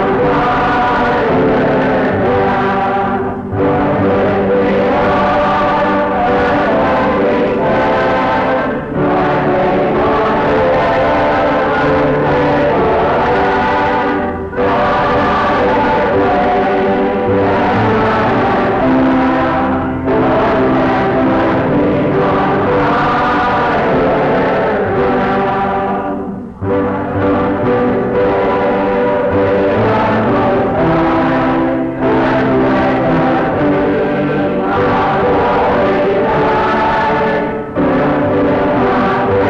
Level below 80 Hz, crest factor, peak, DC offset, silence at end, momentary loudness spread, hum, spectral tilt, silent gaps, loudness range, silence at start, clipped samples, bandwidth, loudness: -34 dBFS; 6 dB; -6 dBFS; under 0.1%; 0 s; 3 LU; none; -8 dB/octave; none; 1 LU; 0 s; under 0.1%; 7.8 kHz; -13 LUFS